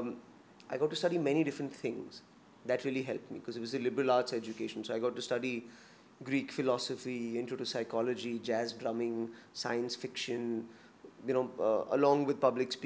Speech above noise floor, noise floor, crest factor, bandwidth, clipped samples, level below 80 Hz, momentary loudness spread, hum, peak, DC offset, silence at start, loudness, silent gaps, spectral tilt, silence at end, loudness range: 23 dB; -57 dBFS; 20 dB; 8 kHz; under 0.1%; -82 dBFS; 12 LU; none; -14 dBFS; under 0.1%; 0 s; -35 LUFS; none; -5 dB/octave; 0 s; 3 LU